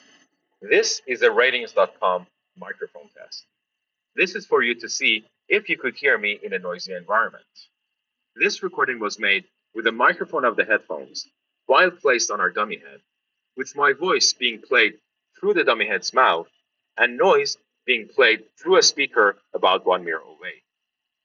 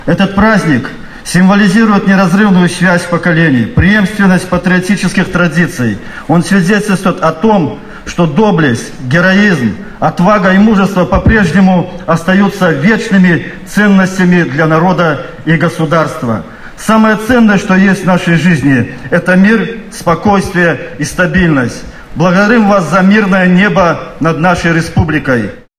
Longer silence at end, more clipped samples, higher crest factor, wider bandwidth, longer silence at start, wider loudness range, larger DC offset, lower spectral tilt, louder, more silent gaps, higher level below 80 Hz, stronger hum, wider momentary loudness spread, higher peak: first, 0.7 s vs 0.2 s; neither; first, 18 dB vs 8 dB; second, 7.4 kHz vs 13.5 kHz; first, 0.6 s vs 0 s; first, 5 LU vs 2 LU; neither; second, 0.5 dB/octave vs -6.5 dB/octave; second, -20 LUFS vs -9 LUFS; neither; second, -78 dBFS vs -30 dBFS; neither; first, 16 LU vs 8 LU; second, -6 dBFS vs 0 dBFS